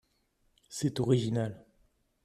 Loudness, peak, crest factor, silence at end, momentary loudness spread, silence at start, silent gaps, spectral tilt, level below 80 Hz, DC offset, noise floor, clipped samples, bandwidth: -31 LUFS; -14 dBFS; 20 dB; 0.65 s; 10 LU; 0.7 s; none; -6.5 dB/octave; -64 dBFS; under 0.1%; -73 dBFS; under 0.1%; 13.5 kHz